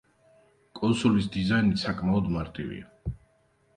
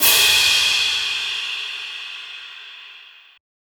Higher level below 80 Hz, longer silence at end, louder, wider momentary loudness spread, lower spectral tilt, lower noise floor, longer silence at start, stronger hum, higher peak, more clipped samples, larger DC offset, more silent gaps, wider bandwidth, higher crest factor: first, -48 dBFS vs -58 dBFS; about the same, 0.6 s vs 0.65 s; second, -27 LUFS vs -16 LUFS; second, 15 LU vs 23 LU; first, -6.5 dB/octave vs 2 dB/octave; first, -66 dBFS vs -45 dBFS; first, 0.75 s vs 0 s; neither; second, -10 dBFS vs -2 dBFS; neither; neither; neither; second, 10 kHz vs over 20 kHz; about the same, 18 dB vs 20 dB